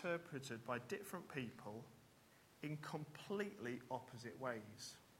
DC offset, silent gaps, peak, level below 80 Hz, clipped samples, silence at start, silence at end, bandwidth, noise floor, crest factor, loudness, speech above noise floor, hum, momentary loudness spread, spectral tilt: under 0.1%; none; -30 dBFS; -84 dBFS; under 0.1%; 0 s; 0 s; 16.5 kHz; -70 dBFS; 20 dB; -49 LUFS; 21 dB; none; 13 LU; -5 dB/octave